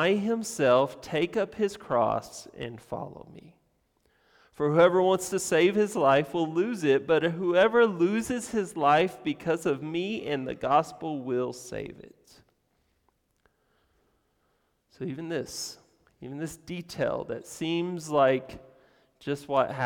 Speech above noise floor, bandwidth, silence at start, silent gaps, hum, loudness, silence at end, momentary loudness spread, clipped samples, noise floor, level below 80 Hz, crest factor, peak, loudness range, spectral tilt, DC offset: 45 dB; 18.5 kHz; 0 s; none; none; -27 LUFS; 0 s; 15 LU; under 0.1%; -72 dBFS; -64 dBFS; 18 dB; -10 dBFS; 15 LU; -5 dB/octave; under 0.1%